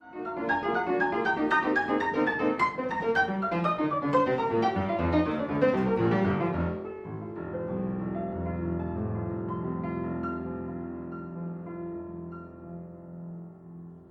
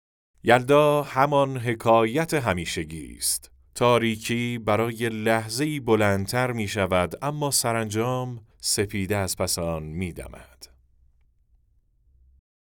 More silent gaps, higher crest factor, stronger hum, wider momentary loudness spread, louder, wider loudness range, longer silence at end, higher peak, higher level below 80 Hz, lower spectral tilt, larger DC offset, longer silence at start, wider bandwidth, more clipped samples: neither; about the same, 18 dB vs 22 dB; neither; first, 17 LU vs 10 LU; second, -29 LUFS vs -24 LUFS; first, 10 LU vs 7 LU; second, 0 s vs 2.05 s; second, -12 dBFS vs -2 dBFS; about the same, -52 dBFS vs -54 dBFS; first, -8 dB/octave vs -4.5 dB/octave; neither; second, 0 s vs 0.45 s; second, 8.2 kHz vs over 20 kHz; neither